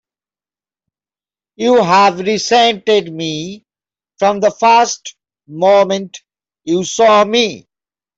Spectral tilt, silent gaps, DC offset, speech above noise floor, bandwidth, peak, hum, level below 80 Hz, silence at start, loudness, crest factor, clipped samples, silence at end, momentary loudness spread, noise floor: -3.5 dB/octave; none; under 0.1%; over 77 dB; 8 kHz; -2 dBFS; none; -62 dBFS; 1.6 s; -13 LUFS; 12 dB; under 0.1%; 0.6 s; 15 LU; under -90 dBFS